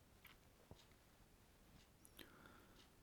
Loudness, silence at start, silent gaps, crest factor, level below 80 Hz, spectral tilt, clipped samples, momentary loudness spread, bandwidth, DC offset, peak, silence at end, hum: -66 LUFS; 0 s; none; 28 dB; -76 dBFS; -3.5 dB/octave; under 0.1%; 6 LU; 19.5 kHz; under 0.1%; -38 dBFS; 0 s; none